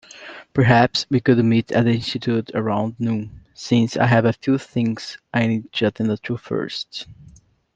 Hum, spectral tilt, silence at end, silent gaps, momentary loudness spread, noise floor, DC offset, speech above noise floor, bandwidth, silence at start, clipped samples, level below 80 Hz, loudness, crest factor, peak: none; -6.5 dB/octave; 0.65 s; none; 14 LU; -40 dBFS; under 0.1%; 21 dB; 7.8 kHz; 0.15 s; under 0.1%; -54 dBFS; -20 LUFS; 20 dB; -2 dBFS